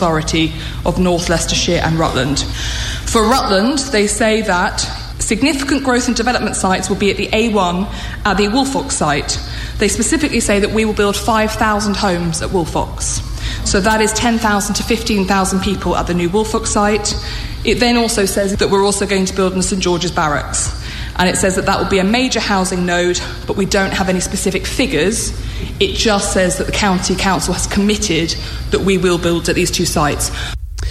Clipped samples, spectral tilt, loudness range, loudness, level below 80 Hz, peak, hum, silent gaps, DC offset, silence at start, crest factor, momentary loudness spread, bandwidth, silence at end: under 0.1%; -4 dB/octave; 1 LU; -15 LUFS; -28 dBFS; 0 dBFS; none; none; under 0.1%; 0 s; 14 dB; 7 LU; 15 kHz; 0 s